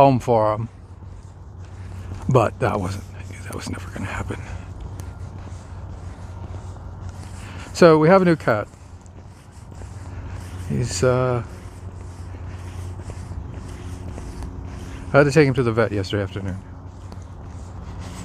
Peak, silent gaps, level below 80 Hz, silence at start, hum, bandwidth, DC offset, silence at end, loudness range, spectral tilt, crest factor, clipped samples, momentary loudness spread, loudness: 0 dBFS; none; -40 dBFS; 0 s; none; 14.5 kHz; under 0.1%; 0 s; 14 LU; -6.5 dB/octave; 22 dB; under 0.1%; 23 LU; -20 LUFS